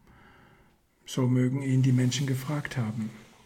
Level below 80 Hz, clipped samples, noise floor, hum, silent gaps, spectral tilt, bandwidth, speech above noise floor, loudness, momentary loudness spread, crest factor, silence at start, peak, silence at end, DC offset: -64 dBFS; under 0.1%; -63 dBFS; none; none; -6 dB/octave; 15 kHz; 36 dB; -28 LUFS; 11 LU; 14 dB; 1.1 s; -16 dBFS; 0.2 s; under 0.1%